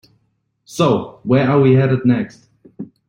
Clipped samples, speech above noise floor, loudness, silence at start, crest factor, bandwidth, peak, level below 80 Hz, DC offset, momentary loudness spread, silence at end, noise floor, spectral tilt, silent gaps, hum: under 0.1%; 51 dB; -15 LUFS; 0.7 s; 14 dB; 10 kHz; -2 dBFS; -54 dBFS; under 0.1%; 19 LU; 0.25 s; -66 dBFS; -7.5 dB/octave; none; none